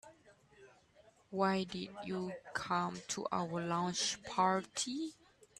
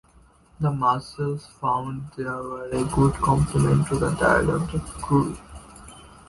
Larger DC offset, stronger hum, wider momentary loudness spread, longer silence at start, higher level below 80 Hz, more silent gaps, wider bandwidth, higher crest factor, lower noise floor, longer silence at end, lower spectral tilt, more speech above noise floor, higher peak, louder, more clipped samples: neither; neither; second, 9 LU vs 13 LU; second, 0.05 s vs 0.6 s; second, -74 dBFS vs -40 dBFS; neither; about the same, 12.5 kHz vs 11.5 kHz; about the same, 20 dB vs 18 dB; first, -67 dBFS vs -55 dBFS; first, 0.45 s vs 0.2 s; second, -3.5 dB/octave vs -7 dB/octave; about the same, 29 dB vs 32 dB; second, -18 dBFS vs -6 dBFS; second, -37 LUFS vs -24 LUFS; neither